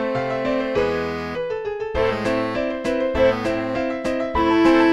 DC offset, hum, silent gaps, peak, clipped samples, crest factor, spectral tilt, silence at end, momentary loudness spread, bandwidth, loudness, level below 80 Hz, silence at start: 0.2%; none; none; -4 dBFS; under 0.1%; 18 dB; -6 dB/octave; 0 s; 9 LU; 11 kHz; -21 LUFS; -40 dBFS; 0 s